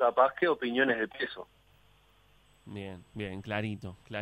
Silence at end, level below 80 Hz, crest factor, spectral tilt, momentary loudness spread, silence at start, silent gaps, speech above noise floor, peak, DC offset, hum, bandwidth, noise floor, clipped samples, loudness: 0 s; -66 dBFS; 22 dB; -7 dB/octave; 18 LU; 0 s; none; 33 dB; -10 dBFS; under 0.1%; none; 13 kHz; -64 dBFS; under 0.1%; -31 LUFS